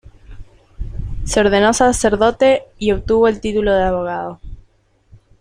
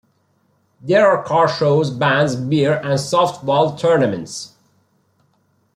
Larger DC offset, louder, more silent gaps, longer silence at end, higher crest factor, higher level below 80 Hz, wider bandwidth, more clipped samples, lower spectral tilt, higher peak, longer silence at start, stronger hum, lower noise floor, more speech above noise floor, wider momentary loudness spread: neither; about the same, -15 LUFS vs -16 LUFS; neither; second, 0.8 s vs 1.3 s; about the same, 16 dB vs 16 dB; first, -32 dBFS vs -60 dBFS; first, 15 kHz vs 13 kHz; neither; about the same, -4.5 dB/octave vs -5.5 dB/octave; about the same, 0 dBFS vs -2 dBFS; second, 0.05 s vs 0.85 s; neither; second, -55 dBFS vs -62 dBFS; second, 40 dB vs 46 dB; first, 17 LU vs 13 LU